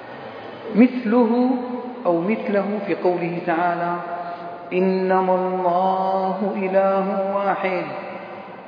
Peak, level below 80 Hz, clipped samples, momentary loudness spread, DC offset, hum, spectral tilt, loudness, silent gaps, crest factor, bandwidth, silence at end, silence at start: -2 dBFS; -74 dBFS; under 0.1%; 14 LU; under 0.1%; none; -9.5 dB/octave; -21 LUFS; none; 18 dB; 5.2 kHz; 0 s; 0 s